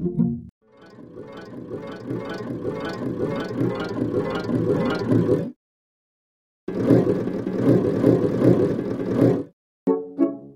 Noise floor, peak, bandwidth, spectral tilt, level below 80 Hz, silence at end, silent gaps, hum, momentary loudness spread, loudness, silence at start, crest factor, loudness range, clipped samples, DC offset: -45 dBFS; -2 dBFS; 11.5 kHz; -9 dB/octave; -54 dBFS; 0 s; 0.49-0.61 s, 5.56-6.67 s, 9.53-9.86 s; none; 16 LU; -23 LUFS; 0 s; 20 dB; 9 LU; under 0.1%; 0.1%